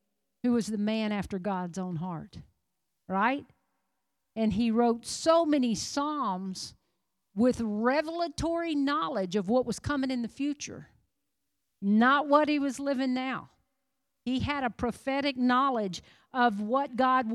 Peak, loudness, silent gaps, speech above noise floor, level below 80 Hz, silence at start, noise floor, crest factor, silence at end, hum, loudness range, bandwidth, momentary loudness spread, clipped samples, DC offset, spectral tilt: -10 dBFS; -29 LUFS; none; 55 dB; -58 dBFS; 0.45 s; -84 dBFS; 20 dB; 0 s; none; 4 LU; 12.5 kHz; 12 LU; under 0.1%; under 0.1%; -5 dB/octave